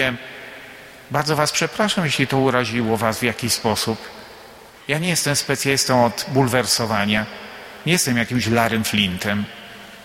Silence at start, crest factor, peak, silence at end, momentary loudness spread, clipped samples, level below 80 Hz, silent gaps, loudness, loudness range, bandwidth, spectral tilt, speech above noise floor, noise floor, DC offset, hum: 0 s; 18 dB; -2 dBFS; 0 s; 18 LU; under 0.1%; -52 dBFS; none; -19 LUFS; 2 LU; 16.5 kHz; -3.5 dB/octave; 23 dB; -43 dBFS; under 0.1%; none